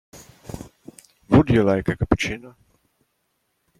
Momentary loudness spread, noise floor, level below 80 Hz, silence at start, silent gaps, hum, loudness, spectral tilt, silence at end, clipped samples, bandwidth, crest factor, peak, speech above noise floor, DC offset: 23 LU; -72 dBFS; -40 dBFS; 0.15 s; none; none; -20 LUFS; -7 dB/octave; 1.3 s; under 0.1%; 15.5 kHz; 22 dB; -2 dBFS; 51 dB; under 0.1%